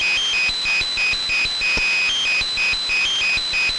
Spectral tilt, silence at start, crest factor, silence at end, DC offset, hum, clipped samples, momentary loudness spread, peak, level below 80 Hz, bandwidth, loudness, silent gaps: 0.5 dB/octave; 0 s; 8 dB; 0 s; under 0.1%; none; under 0.1%; 2 LU; -12 dBFS; -42 dBFS; 11.5 kHz; -17 LUFS; none